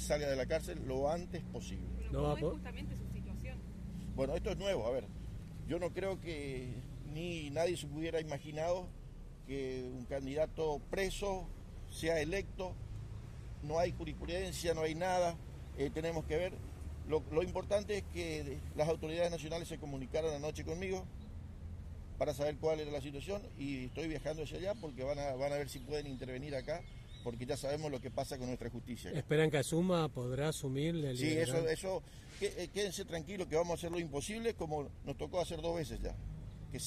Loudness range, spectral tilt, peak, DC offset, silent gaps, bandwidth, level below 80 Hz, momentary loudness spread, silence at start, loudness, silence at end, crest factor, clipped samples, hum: 5 LU; -5.5 dB/octave; -20 dBFS; under 0.1%; none; 14.5 kHz; -50 dBFS; 12 LU; 0 s; -39 LUFS; 0 s; 20 dB; under 0.1%; none